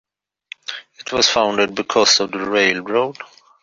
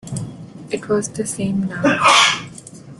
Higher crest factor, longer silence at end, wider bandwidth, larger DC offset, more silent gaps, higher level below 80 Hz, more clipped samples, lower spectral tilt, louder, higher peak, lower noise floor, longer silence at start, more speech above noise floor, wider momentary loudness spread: about the same, 18 dB vs 20 dB; first, 0.4 s vs 0.05 s; second, 7.8 kHz vs 12.5 kHz; neither; neither; about the same, -58 dBFS vs -54 dBFS; neither; second, -1.5 dB/octave vs -3 dB/octave; about the same, -16 LUFS vs -16 LUFS; about the same, -2 dBFS vs 0 dBFS; first, -42 dBFS vs -38 dBFS; first, 0.7 s vs 0.05 s; first, 25 dB vs 21 dB; second, 17 LU vs 23 LU